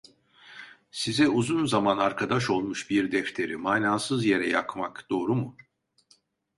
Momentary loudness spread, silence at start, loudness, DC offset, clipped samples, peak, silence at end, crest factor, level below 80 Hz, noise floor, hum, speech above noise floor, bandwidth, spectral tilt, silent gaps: 12 LU; 0.45 s; -26 LUFS; under 0.1%; under 0.1%; -8 dBFS; 1.05 s; 20 dB; -64 dBFS; -65 dBFS; none; 39 dB; 11.5 kHz; -5 dB/octave; none